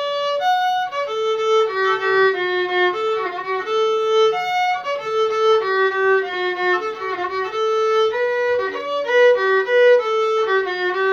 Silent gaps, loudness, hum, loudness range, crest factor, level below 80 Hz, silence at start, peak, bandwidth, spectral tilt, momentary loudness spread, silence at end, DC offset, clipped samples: none; -18 LUFS; none; 2 LU; 14 dB; -68 dBFS; 0 s; -4 dBFS; 7.4 kHz; -3 dB/octave; 8 LU; 0 s; under 0.1%; under 0.1%